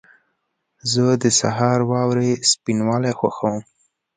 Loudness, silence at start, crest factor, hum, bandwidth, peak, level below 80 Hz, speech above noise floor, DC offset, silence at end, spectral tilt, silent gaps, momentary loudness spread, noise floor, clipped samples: -19 LUFS; 0.85 s; 18 dB; none; 9.6 kHz; -2 dBFS; -58 dBFS; 54 dB; under 0.1%; 0.55 s; -4.5 dB/octave; none; 8 LU; -73 dBFS; under 0.1%